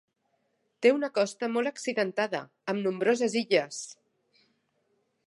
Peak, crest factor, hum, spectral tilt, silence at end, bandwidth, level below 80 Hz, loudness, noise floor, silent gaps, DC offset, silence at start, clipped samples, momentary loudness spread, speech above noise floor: -8 dBFS; 22 dB; none; -4 dB/octave; 1.35 s; 11.5 kHz; -84 dBFS; -28 LUFS; -75 dBFS; none; under 0.1%; 0.8 s; under 0.1%; 10 LU; 47 dB